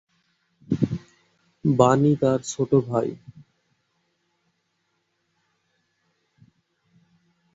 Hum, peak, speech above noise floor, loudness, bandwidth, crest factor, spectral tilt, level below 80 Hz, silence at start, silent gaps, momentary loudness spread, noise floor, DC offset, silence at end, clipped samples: none; -2 dBFS; 53 dB; -22 LUFS; 8 kHz; 24 dB; -7 dB/octave; -58 dBFS; 0.7 s; none; 13 LU; -73 dBFS; under 0.1%; 4.4 s; under 0.1%